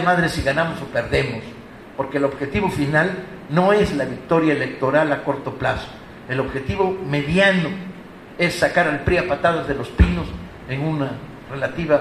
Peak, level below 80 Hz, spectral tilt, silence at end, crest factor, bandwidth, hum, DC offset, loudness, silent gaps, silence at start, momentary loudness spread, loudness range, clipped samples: -2 dBFS; -34 dBFS; -6.5 dB/octave; 0 s; 18 dB; 13.5 kHz; none; under 0.1%; -20 LUFS; none; 0 s; 15 LU; 2 LU; under 0.1%